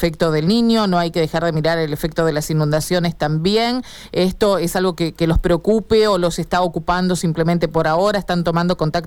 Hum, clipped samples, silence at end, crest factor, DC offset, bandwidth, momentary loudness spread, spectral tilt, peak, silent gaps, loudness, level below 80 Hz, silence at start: none; under 0.1%; 0 s; 12 dB; under 0.1%; 18 kHz; 4 LU; -6 dB/octave; -6 dBFS; none; -18 LUFS; -34 dBFS; 0 s